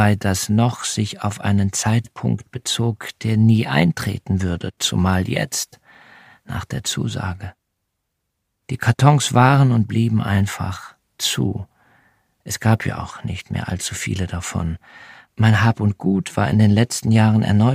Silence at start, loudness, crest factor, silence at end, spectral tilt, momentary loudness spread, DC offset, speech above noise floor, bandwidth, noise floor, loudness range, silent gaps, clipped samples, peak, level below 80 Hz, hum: 0 s; -19 LUFS; 18 dB; 0 s; -5.5 dB/octave; 13 LU; under 0.1%; 57 dB; 15.5 kHz; -75 dBFS; 6 LU; none; under 0.1%; 0 dBFS; -46 dBFS; none